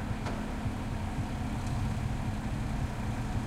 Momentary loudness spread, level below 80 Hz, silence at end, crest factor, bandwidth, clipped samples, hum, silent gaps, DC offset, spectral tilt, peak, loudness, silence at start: 2 LU; -38 dBFS; 0 s; 12 dB; 15.5 kHz; under 0.1%; none; none; under 0.1%; -6.5 dB/octave; -20 dBFS; -35 LUFS; 0 s